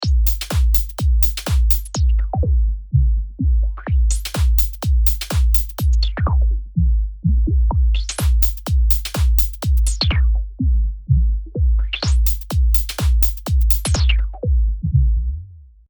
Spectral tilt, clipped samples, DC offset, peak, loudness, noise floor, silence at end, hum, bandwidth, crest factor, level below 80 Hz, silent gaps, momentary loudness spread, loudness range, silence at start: -5 dB/octave; under 0.1%; under 0.1%; -2 dBFS; -19 LUFS; -39 dBFS; 0.3 s; none; over 20 kHz; 14 dB; -18 dBFS; none; 4 LU; 1 LU; 0 s